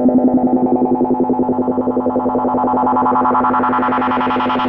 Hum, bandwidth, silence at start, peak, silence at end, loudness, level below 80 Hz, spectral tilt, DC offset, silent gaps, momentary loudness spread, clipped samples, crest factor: none; 4.3 kHz; 0 s; -4 dBFS; 0 s; -15 LUFS; -46 dBFS; -9 dB/octave; under 0.1%; none; 3 LU; under 0.1%; 10 dB